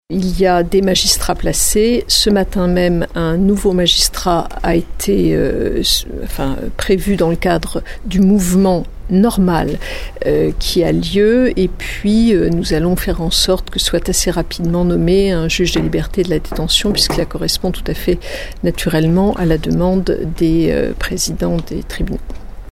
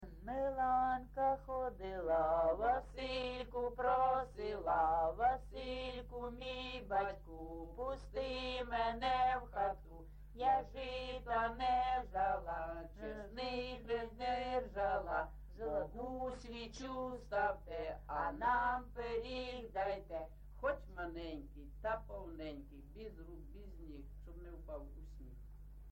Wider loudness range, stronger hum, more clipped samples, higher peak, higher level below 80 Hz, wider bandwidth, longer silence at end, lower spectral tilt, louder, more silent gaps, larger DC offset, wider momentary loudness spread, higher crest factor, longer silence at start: second, 3 LU vs 9 LU; second, none vs 50 Hz at -55 dBFS; neither; first, 0 dBFS vs -24 dBFS; first, -24 dBFS vs -54 dBFS; about the same, 16.5 kHz vs 16.5 kHz; about the same, 0 s vs 0 s; about the same, -4.5 dB/octave vs -5.5 dB/octave; first, -15 LUFS vs -40 LUFS; neither; neither; second, 9 LU vs 19 LU; about the same, 14 dB vs 16 dB; about the same, 0.1 s vs 0 s